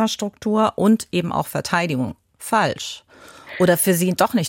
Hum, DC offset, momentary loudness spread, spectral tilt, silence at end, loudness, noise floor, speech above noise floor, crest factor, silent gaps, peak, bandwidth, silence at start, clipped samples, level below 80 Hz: none; under 0.1%; 13 LU; -4.5 dB/octave; 0 s; -20 LUFS; -42 dBFS; 22 dB; 16 dB; none; -4 dBFS; 17 kHz; 0 s; under 0.1%; -56 dBFS